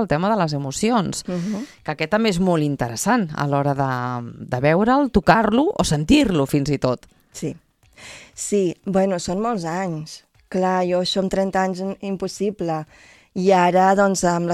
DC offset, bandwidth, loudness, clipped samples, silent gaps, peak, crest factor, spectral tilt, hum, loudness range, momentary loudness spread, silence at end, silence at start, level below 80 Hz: under 0.1%; 14.5 kHz; -20 LUFS; under 0.1%; none; 0 dBFS; 20 dB; -5.5 dB/octave; none; 5 LU; 14 LU; 0 s; 0 s; -44 dBFS